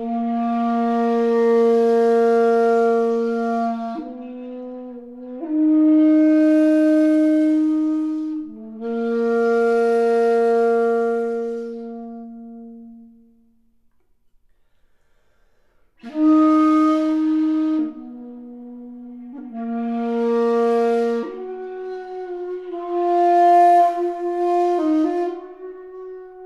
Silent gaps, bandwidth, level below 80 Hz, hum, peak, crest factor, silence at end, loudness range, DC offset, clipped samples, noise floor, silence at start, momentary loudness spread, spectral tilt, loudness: none; 9.6 kHz; -64 dBFS; none; -6 dBFS; 14 dB; 0 s; 7 LU; under 0.1%; under 0.1%; -62 dBFS; 0 s; 21 LU; -6.5 dB/octave; -18 LUFS